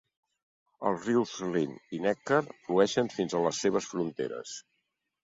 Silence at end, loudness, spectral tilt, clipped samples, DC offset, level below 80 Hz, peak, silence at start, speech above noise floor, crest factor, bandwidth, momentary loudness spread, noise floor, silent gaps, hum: 0.6 s; -30 LUFS; -5 dB/octave; under 0.1%; under 0.1%; -70 dBFS; -10 dBFS; 0.8 s; 51 dB; 20 dB; 8 kHz; 9 LU; -80 dBFS; none; none